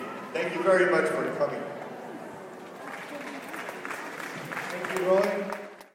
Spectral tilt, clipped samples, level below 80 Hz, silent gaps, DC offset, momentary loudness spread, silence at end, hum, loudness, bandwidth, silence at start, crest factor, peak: -5 dB/octave; under 0.1%; -78 dBFS; none; under 0.1%; 17 LU; 0.05 s; none; -29 LUFS; 16.5 kHz; 0 s; 18 dB; -12 dBFS